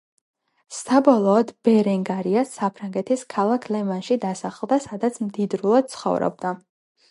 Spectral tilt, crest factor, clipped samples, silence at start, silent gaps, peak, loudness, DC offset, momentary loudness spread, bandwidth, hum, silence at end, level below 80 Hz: -6.5 dB/octave; 20 dB; under 0.1%; 0.7 s; none; -2 dBFS; -22 LUFS; under 0.1%; 11 LU; 11.5 kHz; none; 0.55 s; -68 dBFS